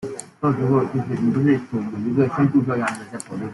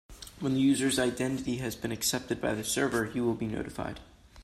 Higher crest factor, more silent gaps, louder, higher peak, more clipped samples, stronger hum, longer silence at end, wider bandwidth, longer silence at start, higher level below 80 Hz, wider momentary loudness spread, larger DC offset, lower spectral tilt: about the same, 16 dB vs 16 dB; neither; first, -21 LUFS vs -30 LUFS; first, -6 dBFS vs -14 dBFS; neither; neither; about the same, 0 s vs 0 s; second, 12 kHz vs 15 kHz; about the same, 0 s vs 0.1 s; about the same, -56 dBFS vs -54 dBFS; about the same, 12 LU vs 11 LU; neither; first, -7.5 dB/octave vs -4 dB/octave